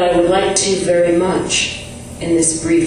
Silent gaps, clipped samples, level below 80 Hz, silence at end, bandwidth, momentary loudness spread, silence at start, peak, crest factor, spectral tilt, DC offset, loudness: none; under 0.1%; -40 dBFS; 0 s; 11.5 kHz; 10 LU; 0 s; 0 dBFS; 16 dB; -3.5 dB/octave; under 0.1%; -15 LUFS